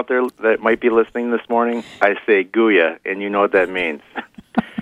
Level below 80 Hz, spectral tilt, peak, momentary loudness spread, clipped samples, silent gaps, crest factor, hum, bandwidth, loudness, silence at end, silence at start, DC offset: -56 dBFS; -6.5 dB/octave; 0 dBFS; 9 LU; under 0.1%; none; 18 dB; none; 11.5 kHz; -18 LUFS; 0 s; 0 s; under 0.1%